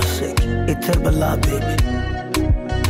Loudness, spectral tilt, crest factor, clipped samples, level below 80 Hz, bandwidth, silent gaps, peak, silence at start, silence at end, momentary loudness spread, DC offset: -20 LUFS; -5.5 dB/octave; 12 dB; under 0.1%; -22 dBFS; 16.5 kHz; none; -6 dBFS; 0 s; 0 s; 3 LU; under 0.1%